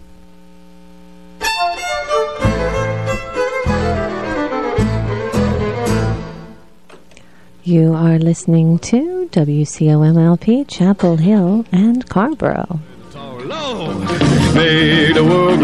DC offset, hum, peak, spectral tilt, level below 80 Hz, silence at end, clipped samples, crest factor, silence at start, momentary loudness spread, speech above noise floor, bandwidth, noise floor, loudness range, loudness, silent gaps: 0.9%; none; 0 dBFS; -6.5 dB/octave; -34 dBFS; 0 s; under 0.1%; 14 dB; 1.4 s; 11 LU; 33 dB; 12 kHz; -45 dBFS; 6 LU; -15 LUFS; none